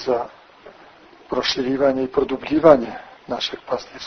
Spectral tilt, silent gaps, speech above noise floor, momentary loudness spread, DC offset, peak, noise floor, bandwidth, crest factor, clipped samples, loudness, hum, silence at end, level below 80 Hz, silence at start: -5 dB/octave; none; 27 dB; 16 LU; under 0.1%; 0 dBFS; -47 dBFS; 6.6 kHz; 22 dB; under 0.1%; -20 LUFS; none; 0 s; -52 dBFS; 0 s